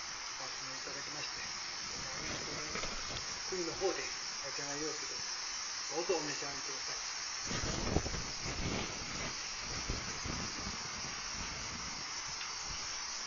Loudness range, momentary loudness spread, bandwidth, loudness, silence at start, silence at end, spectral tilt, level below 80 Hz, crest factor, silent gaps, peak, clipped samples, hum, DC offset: 2 LU; 4 LU; 7.4 kHz; -38 LUFS; 0 s; 0 s; -2 dB/octave; -54 dBFS; 24 dB; none; -16 dBFS; under 0.1%; none; under 0.1%